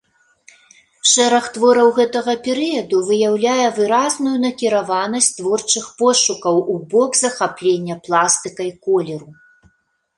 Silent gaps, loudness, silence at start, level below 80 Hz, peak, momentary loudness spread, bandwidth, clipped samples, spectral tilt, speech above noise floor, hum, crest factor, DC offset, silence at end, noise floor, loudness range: none; -16 LUFS; 1.05 s; -64 dBFS; 0 dBFS; 7 LU; 11.5 kHz; under 0.1%; -2.5 dB/octave; 47 dB; none; 16 dB; under 0.1%; 0.85 s; -63 dBFS; 2 LU